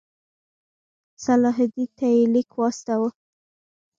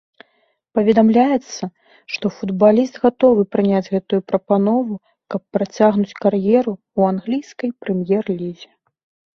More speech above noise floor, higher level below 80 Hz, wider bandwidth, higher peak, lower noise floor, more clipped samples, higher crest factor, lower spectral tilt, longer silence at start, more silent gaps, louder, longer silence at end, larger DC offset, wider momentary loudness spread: first, over 69 dB vs 47 dB; second, -70 dBFS vs -60 dBFS; first, 7.6 kHz vs 6.8 kHz; second, -10 dBFS vs -2 dBFS; first, under -90 dBFS vs -64 dBFS; neither; about the same, 14 dB vs 16 dB; second, -6 dB/octave vs -7.5 dB/octave; first, 1.2 s vs 0.75 s; neither; second, -22 LUFS vs -18 LUFS; first, 0.9 s vs 0.7 s; neither; second, 6 LU vs 13 LU